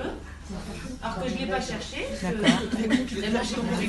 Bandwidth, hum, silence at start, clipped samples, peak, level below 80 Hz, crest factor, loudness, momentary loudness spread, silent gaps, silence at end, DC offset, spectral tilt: 12 kHz; none; 0 s; under 0.1%; -6 dBFS; -42 dBFS; 22 dB; -28 LUFS; 14 LU; none; 0 s; under 0.1%; -4.5 dB/octave